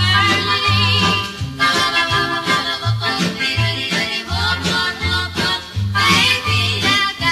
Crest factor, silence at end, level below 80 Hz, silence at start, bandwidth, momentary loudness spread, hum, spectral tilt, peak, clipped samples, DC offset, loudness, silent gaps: 16 dB; 0 s; -38 dBFS; 0 s; 14 kHz; 6 LU; none; -3.5 dB/octave; -2 dBFS; under 0.1%; under 0.1%; -16 LUFS; none